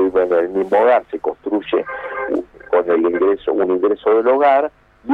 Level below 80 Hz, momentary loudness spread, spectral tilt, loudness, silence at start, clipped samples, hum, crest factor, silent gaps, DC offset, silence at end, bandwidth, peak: -54 dBFS; 11 LU; -7.5 dB/octave; -17 LUFS; 0 s; under 0.1%; none; 14 dB; none; under 0.1%; 0 s; 4.5 kHz; -4 dBFS